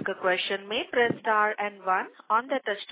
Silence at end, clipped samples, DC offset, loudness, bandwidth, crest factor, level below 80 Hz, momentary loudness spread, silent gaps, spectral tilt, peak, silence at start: 0 s; under 0.1%; under 0.1%; -27 LUFS; 4 kHz; 16 dB; -72 dBFS; 5 LU; none; -7.5 dB/octave; -12 dBFS; 0 s